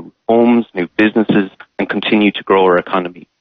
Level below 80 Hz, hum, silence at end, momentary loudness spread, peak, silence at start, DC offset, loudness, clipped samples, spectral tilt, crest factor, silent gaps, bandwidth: -56 dBFS; none; 0.2 s; 9 LU; -2 dBFS; 0 s; under 0.1%; -14 LUFS; under 0.1%; -8.5 dB/octave; 12 dB; none; 5 kHz